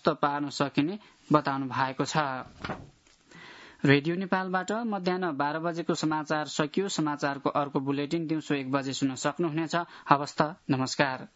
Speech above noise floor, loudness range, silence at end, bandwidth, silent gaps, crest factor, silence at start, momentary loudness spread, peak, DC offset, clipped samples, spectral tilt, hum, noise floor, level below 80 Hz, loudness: 25 dB; 1 LU; 0.1 s; 8 kHz; none; 26 dB; 0.05 s; 7 LU; -4 dBFS; under 0.1%; under 0.1%; -5 dB/octave; none; -53 dBFS; -68 dBFS; -29 LUFS